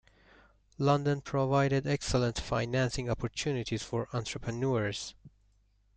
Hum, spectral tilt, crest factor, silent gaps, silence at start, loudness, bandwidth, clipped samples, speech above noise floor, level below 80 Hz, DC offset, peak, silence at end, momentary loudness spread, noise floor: none; -5.5 dB/octave; 18 dB; none; 0.8 s; -31 LUFS; 9.2 kHz; under 0.1%; 37 dB; -50 dBFS; under 0.1%; -14 dBFS; 0.7 s; 8 LU; -68 dBFS